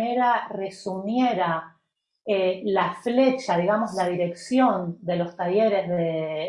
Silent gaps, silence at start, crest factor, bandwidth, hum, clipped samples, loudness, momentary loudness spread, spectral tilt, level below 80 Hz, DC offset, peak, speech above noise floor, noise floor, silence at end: none; 0 s; 16 dB; 11.5 kHz; none; under 0.1%; -24 LUFS; 8 LU; -6.5 dB/octave; -70 dBFS; under 0.1%; -8 dBFS; 51 dB; -75 dBFS; 0 s